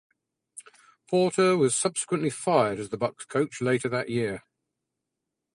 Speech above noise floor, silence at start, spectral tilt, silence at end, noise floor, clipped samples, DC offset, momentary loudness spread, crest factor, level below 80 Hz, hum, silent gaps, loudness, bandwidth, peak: 59 dB; 0.55 s; -4.5 dB/octave; 1.2 s; -85 dBFS; under 0.1%; under 0.1%; 19 LU; 20 dB; -66 dBFS; none; none; -26 LUFS; 11.5 kHz; -8 dBFS